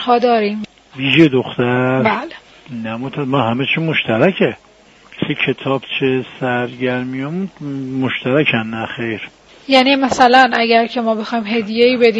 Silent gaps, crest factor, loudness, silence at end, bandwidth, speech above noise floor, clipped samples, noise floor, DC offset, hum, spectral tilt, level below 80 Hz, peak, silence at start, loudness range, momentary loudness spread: none; 16 dB; -15 LUFS; 0 s; 8.2 kHz; 30 dB; under 0.1%; -45 dBFS; under 0.1%; none; -6 dB/octave; -56 dBFS; 0 dBFS; 0 s; 5 LU; 14 LU